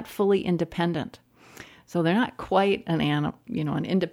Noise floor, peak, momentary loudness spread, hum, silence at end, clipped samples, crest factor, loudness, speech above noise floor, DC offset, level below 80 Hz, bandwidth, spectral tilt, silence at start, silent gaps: -48 dBFS; -8 dBFS; 13 LU; none; 0 s; under 0.1%; 16 dB; -26 LUFS; 23 dB; under 0.1%; -58 dBFS; 16 kHz; -7 dB/octave; 0 s; none